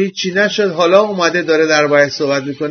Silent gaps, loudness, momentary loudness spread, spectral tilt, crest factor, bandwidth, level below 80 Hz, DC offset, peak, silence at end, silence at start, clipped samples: none; -13 LUFS; 6 LU; -4 dB/octave; 14 dB; 6.6 kHz; -64 dBFS; under 0.1%; 0 dBFS; 0 s; 0 s; under 0.1%